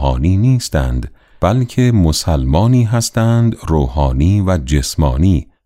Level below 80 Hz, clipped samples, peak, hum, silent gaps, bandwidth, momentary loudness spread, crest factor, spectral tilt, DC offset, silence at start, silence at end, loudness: -22 dBFS; under 0.1%; -2 dBFS; none; none; 15.5 kHz; 5 LU; 12 dB; -6.5 dB/octave; under 0.1%; 0 s; 0.25 s; -14 LUFS